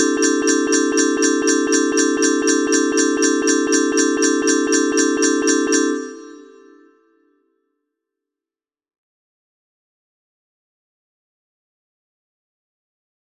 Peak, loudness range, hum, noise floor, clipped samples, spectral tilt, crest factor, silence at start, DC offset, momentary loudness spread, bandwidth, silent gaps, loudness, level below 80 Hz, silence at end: -4 dBFS; 7 LU; none; under -90 dBFS; under 0.1%; -0.5 dB/octave; 16 dB; 0 s; under 0.1%; 1 LU; 15 kHz; none; -16 LUFS; -64 dBFS; 6.9 s